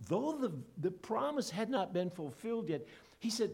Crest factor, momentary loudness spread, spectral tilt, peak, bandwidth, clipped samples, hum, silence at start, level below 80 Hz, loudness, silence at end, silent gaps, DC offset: 16 dB; 7 LU; -5.5 dB/octave; -20 dBFS; 17 kHz; under 0.1%; none; 0 s; -74 dBFS; -38 LUFS; 0 s; none; under 0.1%